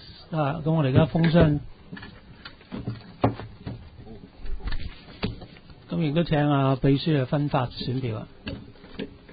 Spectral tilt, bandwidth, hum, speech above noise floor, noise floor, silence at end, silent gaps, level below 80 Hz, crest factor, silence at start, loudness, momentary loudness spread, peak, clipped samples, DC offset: -12 dB/octave; 5 kHz; none; 23 dB; -46 dBFS; 0 s; none; -42 dBFS; 22 dB; 0 s; -25 LUFS; 22 LU; -4 dBFS; under 0.1%; under 0.1%